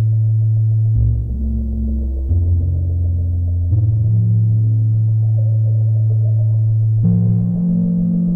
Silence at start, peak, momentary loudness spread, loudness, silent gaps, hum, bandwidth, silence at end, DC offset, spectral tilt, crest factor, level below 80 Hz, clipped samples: 0 s; -6 dBFS; 6 LU; -16 LUFS; none; none; 0.9 kHz; 0 s; under 0.1%; -14.5 dB/octave; 10 dB; -26 dBFS; under 0.1%